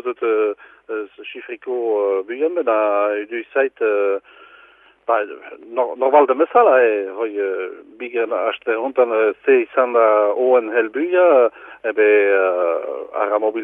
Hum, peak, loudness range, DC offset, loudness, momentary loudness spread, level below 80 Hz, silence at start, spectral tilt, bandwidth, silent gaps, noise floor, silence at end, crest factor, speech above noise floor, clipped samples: none; 0 dBFS; 5 LU; under 0.1%; -18 LUFS; 14 LU; -72 dBFS; 0.05 s; -6.5 dB/octave; 3.7 kHz; none; -50 dBFS; 0 s; 18 dB; 32 dB; under 0.1%